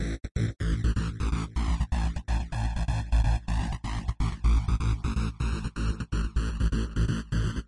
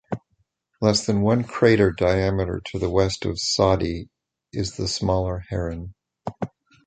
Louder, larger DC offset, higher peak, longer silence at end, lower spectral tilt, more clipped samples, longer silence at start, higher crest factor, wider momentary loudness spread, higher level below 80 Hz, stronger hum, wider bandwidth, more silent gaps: second, -30 LUFS vs -22 LUFS; neither; second, -14 dBFS vs -2 dBFS; second, 0.05 s vs 0.4 s; about the same, -6.5 dB/octave vs -5.5 dB/octave; neither; about the same, 0 s vs 0.1 s; second, 14 dB vs 20 dB; second, 5 LU vs 16 LU; first, -28 dBFS vs -40 dBFS; neither; first, 11 kHz vs 9.4 kHz; first, 0.31-0.35 s vs none